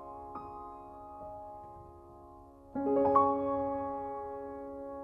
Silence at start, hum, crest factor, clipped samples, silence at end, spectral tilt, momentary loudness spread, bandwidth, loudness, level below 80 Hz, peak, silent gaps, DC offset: 0 s; none; 22 dB; under 0.1%; 0 s; -10 dB/octave; 26 LU; 5.4 kHz; -33 LUFS; -60 dBFS; -14 dBFS; none; under 0.1%